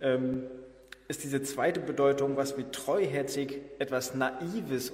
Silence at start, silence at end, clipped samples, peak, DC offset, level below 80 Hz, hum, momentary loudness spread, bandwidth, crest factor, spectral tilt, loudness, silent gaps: 0 s; 0 s; under 0.1%; -12 dBFS; under 0.1%; -64 dBFS; none; 12 LU; 16 kHz; 18 dB; -5 dB/octave; -31 LUFS; none